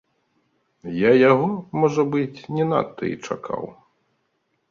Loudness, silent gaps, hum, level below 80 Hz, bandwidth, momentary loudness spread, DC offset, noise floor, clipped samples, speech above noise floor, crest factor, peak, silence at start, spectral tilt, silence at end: -21 LUFS; none; none; -62 dBFS; 7.4 kHz; 16 LU; under 0.1%; -71 dBFS; under 0.1%; 51 dB; 18 dB; -4 dBFS; 0.85 s; -7 dB/octave; 1 s